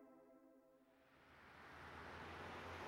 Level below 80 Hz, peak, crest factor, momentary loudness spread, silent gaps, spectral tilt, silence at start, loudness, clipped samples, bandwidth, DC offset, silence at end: -74 dBFS; -42 dBFS; 16 dB; 15 LU; none; -5 dB/octave; 0 s; -56 LUFS; under 0.1%; 16 kHz; under 0.1%; 0 s